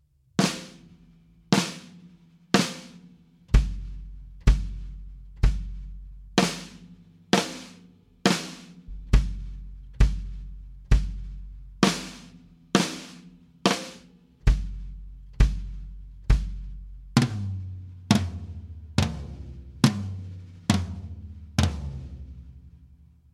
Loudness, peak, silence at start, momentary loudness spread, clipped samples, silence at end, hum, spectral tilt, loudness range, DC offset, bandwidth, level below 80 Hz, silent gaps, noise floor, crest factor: -27 LUFS; -2 dBFS; 0.4 s; 20 LU; under 0.1%; 0.5 s; none; -5 dB/octave; 2 LU; under 0.1%; 14 kHz; -30 dBFS; none; -55 dBFS; 26 dB